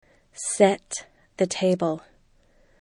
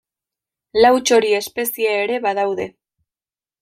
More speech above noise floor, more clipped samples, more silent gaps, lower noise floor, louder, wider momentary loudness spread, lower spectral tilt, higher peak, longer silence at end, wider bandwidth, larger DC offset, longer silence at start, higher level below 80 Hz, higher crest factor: second, 36 dB vs over 73 dB; neither; neither; second, -59 dBFS vs under -90 dBFS; second, -24 LUFS vs -17 LUFS; first, 14 LU vs 10 LU; first, -4.5 dB/octave vs -2.5 dB/octave; about the same, -4 dBFS vs -2 dBFS; about the same, 0.8 s vs 0.9 s; second, 11.5 kHz vs 16 kHz; neither; second, 0.35 s vs 0.75 s; second, -62 dBFS vs -56 dBFS; about the same, 22 dB vs 18 dB